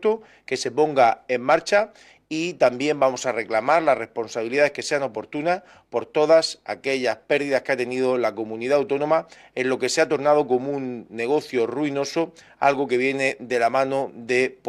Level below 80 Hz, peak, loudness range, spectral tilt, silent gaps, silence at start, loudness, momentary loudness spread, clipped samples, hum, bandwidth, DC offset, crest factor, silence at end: -68 dBFS; -6 dBFS; 2 LU; -4 dB/octave; none; 0 s; -22 LUFS; 10 LU; under 0.1%; none; 13 kHz; under 0.1%; 16 dB; 0 s